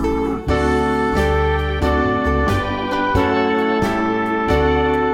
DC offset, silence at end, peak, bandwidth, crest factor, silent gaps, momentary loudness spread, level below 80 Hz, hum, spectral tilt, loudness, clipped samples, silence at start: 0.2%; 0 s; -4 dBFS; 15.5 kHz; 12 dB; none; 3 LU; -26 dBFS; none; -7 dB/octave; -18 LUFS; under 0.1%; 0 s